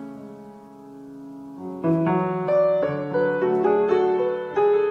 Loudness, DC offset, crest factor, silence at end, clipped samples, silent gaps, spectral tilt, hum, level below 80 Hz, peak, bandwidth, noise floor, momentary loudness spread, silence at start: -22 LUFS; under 0.1%; 14 dB; 0 s; under 0.1%; none; -9 dB/octave; none; -66 dBFS; -8 dBFS; 6.4 kHz; -43 dBFS; 20 LU; 0 s